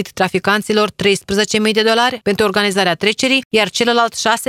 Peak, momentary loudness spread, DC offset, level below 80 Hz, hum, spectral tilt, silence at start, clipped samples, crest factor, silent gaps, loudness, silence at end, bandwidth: 0 dBFS; 3 LU; under 0.1%; -50 dBFS; none; -3 dB/octave; 0 s; under 0.1%; 16 dB; 3.45-3.51 s; -14 LUFS; 0.05 s; 16 kHz